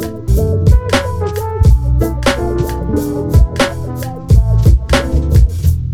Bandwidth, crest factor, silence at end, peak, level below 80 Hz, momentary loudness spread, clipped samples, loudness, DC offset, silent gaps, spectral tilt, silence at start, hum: 16 kHz; 12 dB; 0 s; 0 dBFS; -14 dBFS; 7 LU; under 0.1%; -14 LUFS; under 0.1%; none; -6.5 dB/octave; 0 s; none